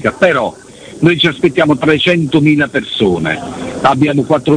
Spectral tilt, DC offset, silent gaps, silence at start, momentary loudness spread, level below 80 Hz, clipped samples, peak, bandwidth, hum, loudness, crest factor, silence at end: -6 dB/octave; under 0.1%; none; 0 s; 6 LU; -44 dBFS; under 0.1%; 0 dBFS; 10 kHz; none; -12 LUFS; 12 dB; 0 s